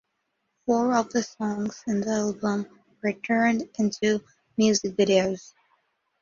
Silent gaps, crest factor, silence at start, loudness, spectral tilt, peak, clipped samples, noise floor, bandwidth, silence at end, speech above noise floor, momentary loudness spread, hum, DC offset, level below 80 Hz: none; 18 dB; 0.65 s; -25 LUFS; -4.5 dB/octave; -8 dBFS; under 0.1%; -77 dBFS; 7.4 kHz; 0.8 s; 52 dB; 9 LU; none; under 0.1%; -64 dBFS